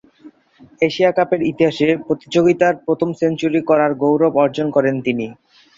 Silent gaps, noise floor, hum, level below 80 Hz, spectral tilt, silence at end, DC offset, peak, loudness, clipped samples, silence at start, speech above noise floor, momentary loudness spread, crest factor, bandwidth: none; -49 dBFS; none; -58 dBFS; -6.5 dB/octave; 0.45 s; under 0.1%; -2 dBFS; -17 LUFS; under 0.1%; 0.25 s; 32 dB; 6 LU; 16 dB; 7.6 kHz